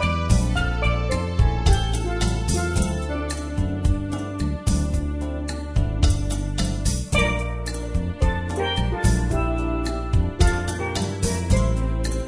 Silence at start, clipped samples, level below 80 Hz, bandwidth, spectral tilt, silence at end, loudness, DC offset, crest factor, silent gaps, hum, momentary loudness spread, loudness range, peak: 0 s; under 0.1%; -24 dBFS; 11 kHz; -5.5 dB/octave; 0 s; -24 LUFS; under 0.1%; 16 dB; none; none; 6 LU; 2 LU; -4 dBFS